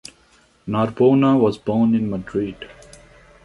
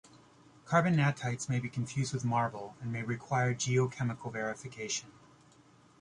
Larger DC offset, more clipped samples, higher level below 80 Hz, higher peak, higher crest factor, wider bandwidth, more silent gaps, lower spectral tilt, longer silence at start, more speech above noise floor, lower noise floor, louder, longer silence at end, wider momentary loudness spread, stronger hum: neither; neither; first, -52 dBFS vs -66 dBFS; first, -4 dBFS vs -14 dBFS; about the same, 16 dB vs 20 dB; about the same, 11.5 kHz vs 11 kHz; neither; first, -8 dB/octave vs -5.5 dB/octave; first, 0.65 s vs 0.15 s; first, 38 dB vs 29 dB; second, -56 dBFS vs -62 dBFS; first, -19 LUFS vs -33 LUFS; second, 0.75 s vs 0.9 s; first, 20 LU vs 9 LU; neither